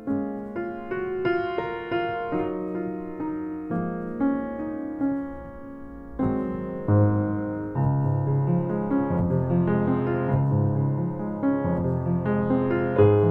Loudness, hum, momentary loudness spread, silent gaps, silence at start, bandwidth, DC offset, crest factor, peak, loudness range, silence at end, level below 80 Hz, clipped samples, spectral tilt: -26 LUFS; none; 9 LU; none; 0 s; 5.4 kHz; under 0.1%; 18 dB; -6 dBFS; 5 LU; 0 s; -50 dBFS; under 0.1%; -11 dB/octave